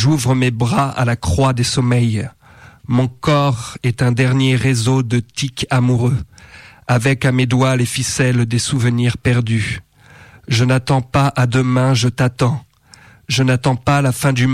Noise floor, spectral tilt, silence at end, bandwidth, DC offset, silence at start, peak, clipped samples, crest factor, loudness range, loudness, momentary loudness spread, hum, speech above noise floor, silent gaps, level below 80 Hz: -46 dBFS; -5.5 dB/octave; 0 s; 14 kHz; under 0.1%; 0 s; -6 dBFS; under 0.1%; 10 dB; 1 LU; -16 LUFS; 5 LU; none; 31 dB; none; -40 dBFS